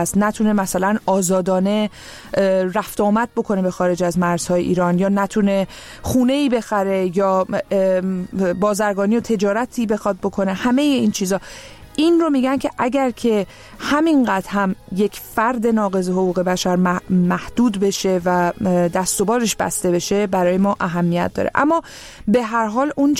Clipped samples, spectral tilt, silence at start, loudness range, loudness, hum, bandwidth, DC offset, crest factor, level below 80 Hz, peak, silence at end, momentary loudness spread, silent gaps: under 0.1%; -5.5 dB/octave; 0 s; 1 LU; -18 LUFS; none; 16.5 kHz; under 0.1%; 16 dB; -46 dBFS; -2 dBFS; 0 s; 5 LU; none